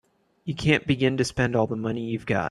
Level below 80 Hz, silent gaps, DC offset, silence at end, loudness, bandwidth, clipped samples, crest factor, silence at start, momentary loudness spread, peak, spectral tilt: -50 dBFS; none; under 0.1%; 0 s; -25 LUFS; 12 kHz; under 0.1%; 22 dB; 0.45 s; 8 LU; -4 dBFS; -6 dB/octave